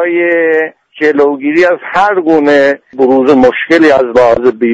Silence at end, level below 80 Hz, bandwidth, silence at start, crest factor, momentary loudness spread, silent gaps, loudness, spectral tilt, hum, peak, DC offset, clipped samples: 0 s; -44 dBFS; 8 kHz; 0 s; 8 dB; 5 LU; none; -9 LUFS; -6 dB/octave; none; 0 dBFS; under 0.1%; 0.2%